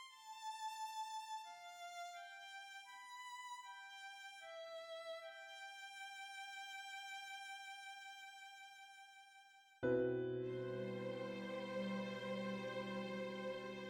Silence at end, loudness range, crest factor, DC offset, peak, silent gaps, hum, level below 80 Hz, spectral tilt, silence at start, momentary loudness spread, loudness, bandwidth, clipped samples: 0 s; 8 LU; 20 dB; under 0.1%; -28 dBFS; none; none; -84 dBFS; -4.5 dB/octave; 0 s; 11 LU; -48 LUFS; over 20 kHz; under 0.1%